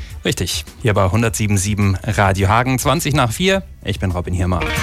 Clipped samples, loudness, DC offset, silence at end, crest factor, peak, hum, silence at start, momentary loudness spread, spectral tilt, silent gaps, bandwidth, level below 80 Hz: under 0.1%; -17 LUFS; under 0.1%; 0 s; 14 dB; -2 dBFS; none; 0 s; 6 LU; -5 dB/octave; none; 16 kHz; -32 dBFS